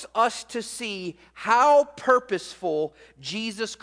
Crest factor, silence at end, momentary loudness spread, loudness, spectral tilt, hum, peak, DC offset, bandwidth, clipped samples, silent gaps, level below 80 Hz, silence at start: 20 dB; 0.1 s; 15 LU; -24 LUFS; -3 dB/octave; none; -6 dBFS; under 0.1%; 10.5 kHz; under 0.1%; none; -66 dBFS; 0 s